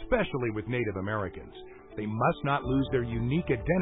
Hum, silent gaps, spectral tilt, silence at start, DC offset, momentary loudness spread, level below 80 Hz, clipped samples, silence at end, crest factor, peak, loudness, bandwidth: none; none; -11 dB/octave; 0 s; under 0.1%; 13 LU; -44 dBFS; under 0.1%; 0 s; 16 dB; -12 dBFS; -30 LUFS; 4 kHz